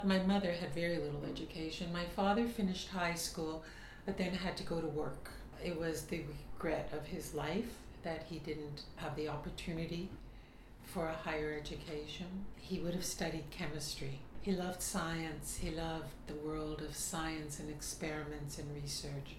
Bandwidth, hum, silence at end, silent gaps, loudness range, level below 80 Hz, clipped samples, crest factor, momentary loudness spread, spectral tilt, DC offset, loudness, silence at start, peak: 16.5 kHz; none; 0 s; none; 5 LU; -54 dBFS; under 0.1%; 20 dB; 10 LU; -4.5 dB/octave; under 0.1%; -41 LUFS; 0 s; -20 dBFS